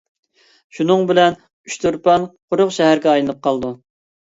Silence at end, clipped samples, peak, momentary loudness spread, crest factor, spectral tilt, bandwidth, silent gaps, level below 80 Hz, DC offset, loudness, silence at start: 0.5 s; under 0.1%; 0 dBFS; 13 LU; 16 dB; -5 dB/octave; 8 kHz; 1.53-1.64 s, 2.42-2.48 s; -56 dBFS; under 0.1%; -16 LUFS; 0.75 s